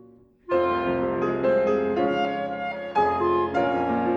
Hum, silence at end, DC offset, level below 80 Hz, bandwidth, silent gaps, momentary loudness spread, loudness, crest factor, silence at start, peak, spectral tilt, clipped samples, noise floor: none; 0 s; under 0.1%; -56 dBFS; 7.2 kHz; none; 5 LU; -24 LUFS; 12 dB; 0.5 s; -12 dBFS; -7.5 dB/octave; under 0.1%; -47 dBFS